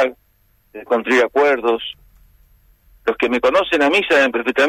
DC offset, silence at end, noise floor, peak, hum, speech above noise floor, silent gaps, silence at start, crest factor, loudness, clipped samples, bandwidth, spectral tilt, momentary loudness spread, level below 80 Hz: under 0.1%; 0 s; -58 dBFS; -6 dBFS; none; 42 dB; none; 0 s; 12 dB; -16 LUFS; under 0.1%; 14.5 kHz; -3.5 dB/octave; 10 LU; -52 dBFS